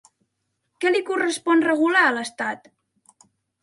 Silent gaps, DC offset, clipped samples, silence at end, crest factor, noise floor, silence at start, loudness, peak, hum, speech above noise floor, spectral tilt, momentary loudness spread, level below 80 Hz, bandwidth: none; under 0.1%; under 0.1%; 1.05 s; 18 dB; -76 dBFS; 0.8 s; -21 LUFS; -6 dBFS; none; 55 dB; -2.5 dB/octave; 11 LU; -76 dBFS; 11.5 kHz